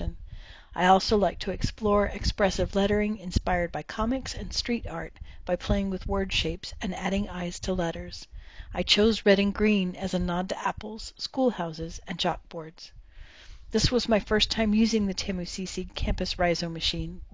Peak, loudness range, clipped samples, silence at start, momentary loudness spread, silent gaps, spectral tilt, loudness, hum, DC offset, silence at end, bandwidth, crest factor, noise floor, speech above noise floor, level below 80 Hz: -8 dBFS; 5 LU; under 0.1%; 0 s; 16 LU; none; -5 dB/octave; -27 LUFS; none; 0.1%; 0.05 s; 7.8 kHz; 20 dB; -47 dBFS; 20 dB; -38 dBFS